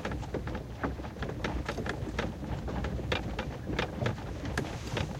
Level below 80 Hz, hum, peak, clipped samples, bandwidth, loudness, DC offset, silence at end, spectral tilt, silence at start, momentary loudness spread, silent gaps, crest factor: -42 dBFS; none; -14 dBFS; under 0.1%; 16 kHz; -36 LUFS; under 0.1%; 0 s; -6 dB/octave; 0 s; 4 LU; none; 22 dB